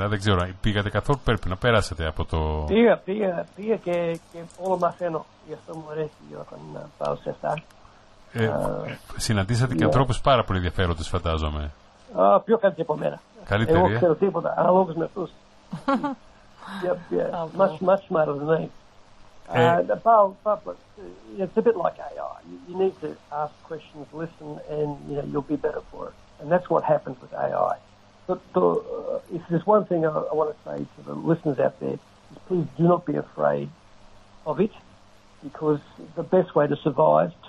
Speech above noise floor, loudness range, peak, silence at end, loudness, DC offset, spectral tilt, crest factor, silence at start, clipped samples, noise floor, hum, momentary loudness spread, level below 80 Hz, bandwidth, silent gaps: 28 dB; 8 LU; -6 dBFS; 0 s; -24 LUFS; under 0.1%; -6.5 dB/octave; 18 dB; 0 s; under 0.1%; -52 dBFS; none; 18 LU; -42 dBFS; 12 kHz; none